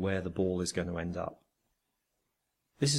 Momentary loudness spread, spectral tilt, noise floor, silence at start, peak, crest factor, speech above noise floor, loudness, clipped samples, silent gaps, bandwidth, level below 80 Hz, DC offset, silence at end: 7 LU; -4.5 dB/octave; -82 dBFS; 0 s; -14 dBFS; 20 dB; 49 dB; -34 LUFS; under 0.1%; none; 14 kHz; -62 dBFS; under 0.1%; 0 s